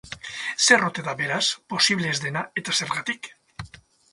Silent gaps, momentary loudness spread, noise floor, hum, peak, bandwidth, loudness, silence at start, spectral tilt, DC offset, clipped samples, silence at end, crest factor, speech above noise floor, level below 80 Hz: none; 23 LU; -48 dBFS; none; -2 dBFS; 11.5 kHz; -22 LUFS; 0.05 s; -2 dB/octave; under 0.1%; under 0.1%; 0.45 s; 24 dB; 24 dB; -60 dBFS